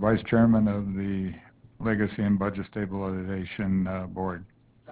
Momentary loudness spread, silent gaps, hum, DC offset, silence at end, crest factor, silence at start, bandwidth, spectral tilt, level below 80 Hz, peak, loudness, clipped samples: 12 LU; none; none; under 0.1%; 0 s; 18 dB; 0 s; 4 kHz; -12 dB/octave; -48 dBFS; -10 dBFS; -27 LUFS; under 0.1%